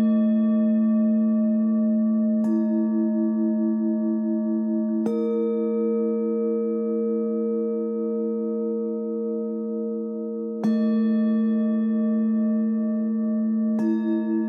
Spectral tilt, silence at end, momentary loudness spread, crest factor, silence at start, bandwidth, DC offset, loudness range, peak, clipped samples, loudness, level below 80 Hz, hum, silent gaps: -10.5 dB/octave; 0 s; 7 LU; 10 dB; 0 s; 3.6 kHz; under 0.1%; 4 LU; -12 dBFS; under 0.1%; -24 LUFS; -88 dBFS; none; none